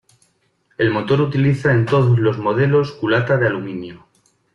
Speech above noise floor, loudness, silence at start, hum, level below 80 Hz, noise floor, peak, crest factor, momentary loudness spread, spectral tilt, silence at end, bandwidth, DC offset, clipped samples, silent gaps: 46 dB; -17 LUFS; 0.8 s; none; -52 dBFS; -62 dBFS; -4 dBFS; 14 dB; 9 LU; -8.5 dB/octave; 0.6 s; 7.2 kHz; under 0.1%; under 0.1%; none